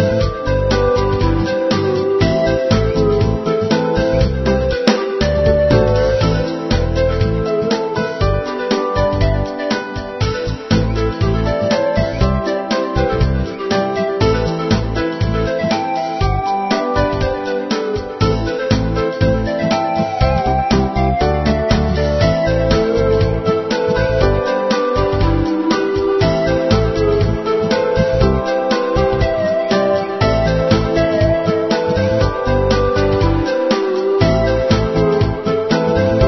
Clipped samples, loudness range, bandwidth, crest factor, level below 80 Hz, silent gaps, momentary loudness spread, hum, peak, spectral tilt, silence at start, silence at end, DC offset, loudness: under 0.1%; 3 LU; 6.2 kHz; 14 dB; -24 dBFS; none; 4 LU; none; 0 dBFS; -7 dB/octave; 0 s; 0 s; under 0.1%; -16 LUFS